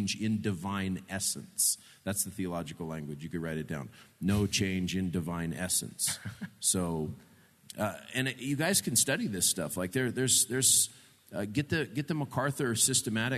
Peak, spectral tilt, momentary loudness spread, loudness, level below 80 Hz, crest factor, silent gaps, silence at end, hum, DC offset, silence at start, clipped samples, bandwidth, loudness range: -10 dBFS; -3 dB/octave; 13 LU; -30 LUFS; -64 dBFS; 22 dB; none; 0 s; none; under 0.1%; 0 s; under 0.1%; 14 kHz; 6 LU